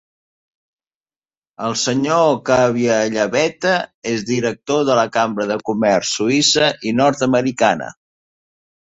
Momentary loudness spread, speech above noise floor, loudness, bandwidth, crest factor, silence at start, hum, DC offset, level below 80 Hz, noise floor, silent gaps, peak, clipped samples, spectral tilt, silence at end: 6 LU; over 73 dB; -17 LUFS; 8.2 kHz; 16 dB; 1.6 s; none; under 0.1%; -56 dBFS; under -90 dBFS; 3.94-4.02 s; -2 dBFS; under 0.1%; -4 dB/octave; 0.9 s